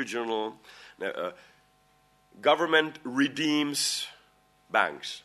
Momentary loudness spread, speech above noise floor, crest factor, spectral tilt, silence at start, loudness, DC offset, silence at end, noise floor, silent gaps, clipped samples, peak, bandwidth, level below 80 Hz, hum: 13 LU; 36 dB; 22 dB; -2.5 dB/octave; 0 s; -28 LUFS; under 0.1%; 0.05 s; -65 dBFS; none; under 0.1%; -8 dBFS; 13.5 kHz; -76 dBFS; 50 Hz at -65 dBFS